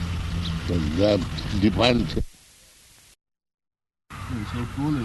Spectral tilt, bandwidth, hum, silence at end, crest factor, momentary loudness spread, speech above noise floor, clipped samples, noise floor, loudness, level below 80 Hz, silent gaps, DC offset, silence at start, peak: -6.5 dB/octave; 12 kHz; none; 0 s; 22 dB; 14 LU; 31 dB; under 0.1%; -53 dBFS; -24 LUFS; -36 dBFS; 3.54-3.58 s; under 0.1%; 0 s; -4 dBFS